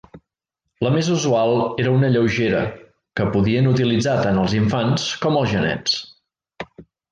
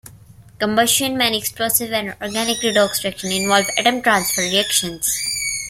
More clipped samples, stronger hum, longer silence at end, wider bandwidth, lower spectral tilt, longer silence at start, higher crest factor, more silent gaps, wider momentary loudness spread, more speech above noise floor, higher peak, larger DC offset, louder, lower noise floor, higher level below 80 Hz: neither; neither; first, 0.3 s vs 0 s; second, 9.2 kHz vs 16.5 kHz; first, -6 dB/octave vs -1.5 dB/octave; about the same, 0.15 s vs 0.05 s; about the same, 14 dB vs 18 dB; neither; about the same, 9 LU vs 7 LU; first, 61 dB vs 25 dB; second, -6 dBFS vs -2 dBFS; neither; about the same, -19 LUFS vs -18 LUFS; first, -80 dBFS vs -44 dBFS; first, -46 dBFS vs -52 dBFS